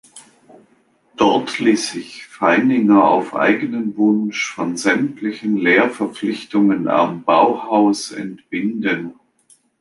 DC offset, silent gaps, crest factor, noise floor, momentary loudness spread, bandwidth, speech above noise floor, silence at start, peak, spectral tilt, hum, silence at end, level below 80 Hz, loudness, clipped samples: under 0.1%; none; 16 dB; -57 dBFS; 10 LU; 11.5 kHz; 41 dB; 0.15 s; 0 dBFS; -5 dB/octave; none; 0.7 s; -64 dBFS; -17 LUFS; under 0.1%